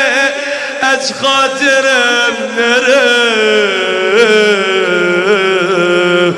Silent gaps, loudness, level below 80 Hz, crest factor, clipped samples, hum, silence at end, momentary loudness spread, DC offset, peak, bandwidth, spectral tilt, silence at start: none; -10 LUFS; -60 dBFS; 10 dB; under 0.1%; none; 0 s; 4 LU; under 0.1%; 0 dBFS; 12.5 kHz; -3 dB/octave; 0 s